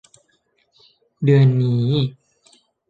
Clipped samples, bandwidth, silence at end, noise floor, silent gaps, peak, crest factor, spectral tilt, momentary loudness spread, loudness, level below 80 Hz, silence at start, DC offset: under 0.1%; 7.6 kHz; 0.8 s; -65 dBFS; none; -4 dBFS; 16 dB; -9 dB/octave; 9 LU; -18 LUFS; -58 dBFS; 1.2 s; under 0.1%